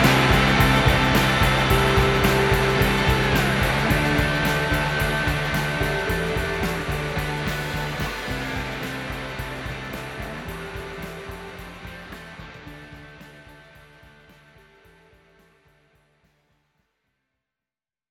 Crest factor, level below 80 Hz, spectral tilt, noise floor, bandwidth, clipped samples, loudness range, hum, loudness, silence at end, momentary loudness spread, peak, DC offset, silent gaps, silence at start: 20 dB; -34 dBFS; -5 dB/octave; under -90 dBFS; 18.5 kHz; under 0.1%; 20 LU; none; -21 LUFS; 4.55 s; 20 LU; -4 dBFS; under 0.1%; none; 0 s